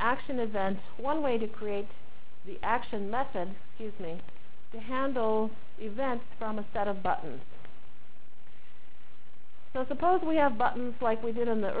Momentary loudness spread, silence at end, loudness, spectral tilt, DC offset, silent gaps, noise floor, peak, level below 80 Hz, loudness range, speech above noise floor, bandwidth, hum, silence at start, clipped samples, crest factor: 16 LU; 0 s; -32 LUFS; -9 dB/octave; 4%; none; -61 dBFS; -14 dBFS; -58 dBFS; 6 LU; 29 dB; 4 kHz; none; 0 s; under 0.1%; 18 dB